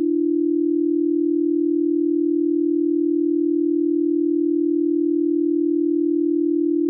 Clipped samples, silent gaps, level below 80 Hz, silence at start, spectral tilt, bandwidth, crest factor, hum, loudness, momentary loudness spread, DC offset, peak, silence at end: under 0.1%; none; -88 dBFS; 0 s; -15.5 dB/octave; 0.4 kHz; 6 dB; none; -20 LUFS; 0 LU; under 0.1%; -14 dBFS; 0 s